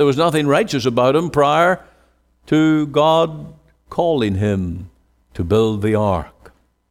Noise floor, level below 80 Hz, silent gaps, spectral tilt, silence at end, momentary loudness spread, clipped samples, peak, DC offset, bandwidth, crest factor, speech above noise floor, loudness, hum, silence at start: -57 dBFS; -44 dBFS; none; -6.5 dB/octave; 0.65 s; 13 LU; under 0.1%; -4 dBFS; under 0.1%; 14.5 kHz; 14 dB; 41 dB; -17 LUFS; none; 0 s